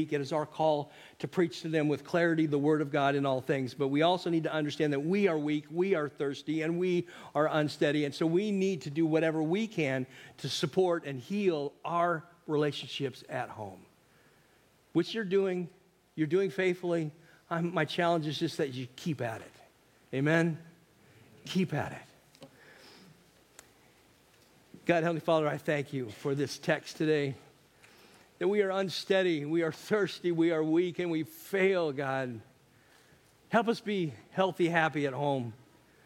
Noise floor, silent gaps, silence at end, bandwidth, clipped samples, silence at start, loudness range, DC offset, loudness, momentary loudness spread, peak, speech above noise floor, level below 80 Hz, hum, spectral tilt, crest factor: -65 dBFS; none; 0.5 s; 16.5 kHz; under 0.1%; 0 s; 6 LU; under 0.1%; -31 LUFS; 9 LU; -10 dBFS; 35 dB; -76 dBFS; none; -6 dB/octave; 22 dB